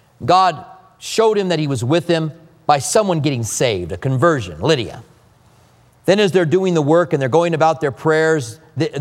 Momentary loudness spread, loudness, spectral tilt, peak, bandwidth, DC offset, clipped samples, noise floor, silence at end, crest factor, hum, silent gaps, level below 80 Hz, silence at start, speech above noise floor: 9 LU; -17 LUFS; -5 dB/octave; 0 dBFS; 15.5 kHz; under 0.1%; under 0.1%; -51 dBFS; 0 s; 16 dB; none; none; -52 dBFS; 0.2 s; 35 dB